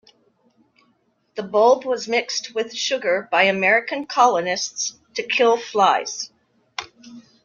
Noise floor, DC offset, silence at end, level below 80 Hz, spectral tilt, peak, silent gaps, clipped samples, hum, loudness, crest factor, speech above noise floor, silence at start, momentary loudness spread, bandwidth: -65 dBFS; under 0.1%; 0.25 s; -72 dBFS; -2 dB/octave; -2 dBFS; none; under 0.1%; none; -20 LUFS; 20 dB; 45 dB; 1.35 s; 17 LU; 7.4 kHz